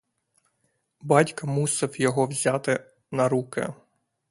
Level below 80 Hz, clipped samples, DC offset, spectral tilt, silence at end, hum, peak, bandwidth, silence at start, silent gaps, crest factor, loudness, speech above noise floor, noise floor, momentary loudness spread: -68 dBFS; under 0.1%; under 0.1%; -5 dB/octave; 0.55 s; none; -2 dBFS; 11.5 kHz; 1.05 s; none; 24 dB; -25 LUFS; 49 dB; -73 dBFS; 11 LU